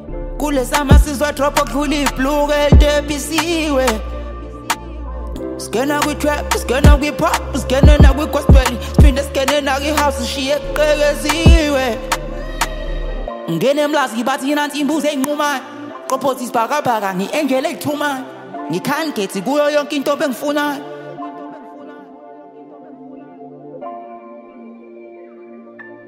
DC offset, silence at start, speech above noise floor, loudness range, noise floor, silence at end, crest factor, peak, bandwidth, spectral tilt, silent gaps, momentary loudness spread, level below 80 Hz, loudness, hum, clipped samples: under 0.1%; 0 s; 23 dB; 19 LU; -38 dBFS; 0.05 s; 16 dB; 0 dBFS; 16 kHz; -5.5 dB/octave; none; 20 LU; -20 dBFS; -16 LUFS; none; under 0.1%